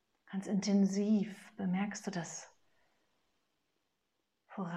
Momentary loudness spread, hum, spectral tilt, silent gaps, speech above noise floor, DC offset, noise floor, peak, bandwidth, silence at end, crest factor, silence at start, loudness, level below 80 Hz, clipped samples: 14 LU; none; -6 dB/octave; none; 50 dB; under 0.1%; -84 dBFS; -22 dBFS; 10 kHz; 0 s; 16 dB; 0.3 s; -35 LUFS; -86 dBFS; under 0.1%